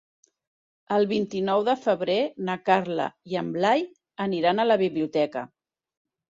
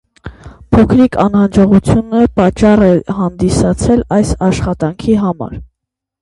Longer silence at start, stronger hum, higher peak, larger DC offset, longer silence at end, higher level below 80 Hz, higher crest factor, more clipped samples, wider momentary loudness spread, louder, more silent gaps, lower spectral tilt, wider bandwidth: first, 0.9 s vs 0.25 s; neither; second, -6 dBFS vs 0 dBFS; neither; first, 0.85 s vs 0.6 s; second, -70 dBFS vs -28 dBFS; first, 20 dB vs 12 dB; neither; about the same, 8 LU vs 9 LU; second, -25 LUFS vs -11 LUFS; neither; about the same, -6.5 dB/octave vs -7.5 dB/octave; second, 7.8 kHz vs 11.5 kHz